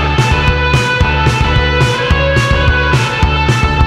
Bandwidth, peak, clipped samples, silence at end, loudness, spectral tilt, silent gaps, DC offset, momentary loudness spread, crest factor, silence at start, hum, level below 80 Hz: 12.5 kHz; 0 dBFS; under 0.1%; 0 s; -11 LUFS; -5.5 dB/octave; none; under 0.1%; 1 LU; 10 dB; 0 s; none; -16 dBFS